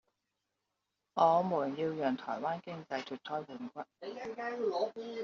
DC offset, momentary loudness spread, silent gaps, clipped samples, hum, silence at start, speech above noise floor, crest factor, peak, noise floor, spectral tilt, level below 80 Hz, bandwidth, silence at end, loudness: under 0.1%; 16 LU; none; under 0.1%; none; 1.15 s; 51 dB; 22 dB; -14 dBFS; -86 dBFS; -4.5 dB/octave; -80 dBFS; 7.2 kHz; 0 s; -35 LUFS